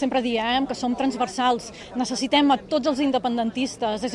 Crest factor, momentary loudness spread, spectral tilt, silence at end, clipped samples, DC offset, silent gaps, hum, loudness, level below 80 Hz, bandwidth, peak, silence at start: 16 dB; 7 LU; -3.5 dB/octave; 0 s; under 0.1%; under 0.1%; none; none; -23 LUFS; -54 dBFS; 11.5 kHz; -8 dBFS; 0 s